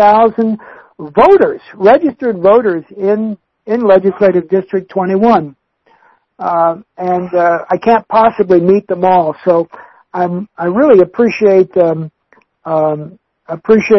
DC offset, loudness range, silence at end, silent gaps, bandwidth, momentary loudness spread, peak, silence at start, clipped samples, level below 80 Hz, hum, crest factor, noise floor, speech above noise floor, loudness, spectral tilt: under 0.1%; 3 LU; 0 s; none; 6.2 kHz; 14 LU; 0 dBFS; 0 s; 0.2%; -50 dBFS; none; 12 dB; -52 dBFS; 42 dB; -12 LUFS; -8.5 dB/octave